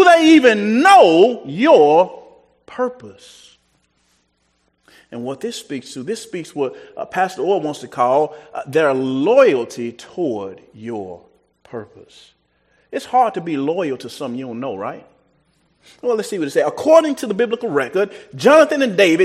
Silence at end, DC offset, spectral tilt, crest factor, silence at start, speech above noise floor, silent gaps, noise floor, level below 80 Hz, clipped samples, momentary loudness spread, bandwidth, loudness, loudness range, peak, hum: 0 s; under 0.1%; -5 dB/octave; 16 dB; 0 s; 48 dB; none; -64 dBFS; -66 dBFS; under 0.1%; 19 LU; 14 kHz; -16 LUFS; 15 LU; 0 dBFS; none